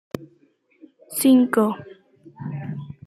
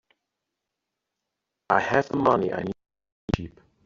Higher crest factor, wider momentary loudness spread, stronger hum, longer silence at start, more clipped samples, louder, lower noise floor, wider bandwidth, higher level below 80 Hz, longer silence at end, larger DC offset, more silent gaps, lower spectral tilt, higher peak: second, 18 dB vs 24 dB; about the same, 20 LU vs 19 LU; neither; second, 0.15 s vs 1.7 s; neither; first, -20 LUFS vs -25 LUFS; second, -60 dBFS vs -84 dBFS; first, 14.5 kHz vs 7.6 kHz; second, -68 dBFS vs -50 dBFS; second, 0.15 s vs 0.4 s; neither; second, none vs 3.12-3.28 s; about the same, -5.5 dB/octave vs -5 dB/octave; about the same, -6 dBFS vs -4 dBFS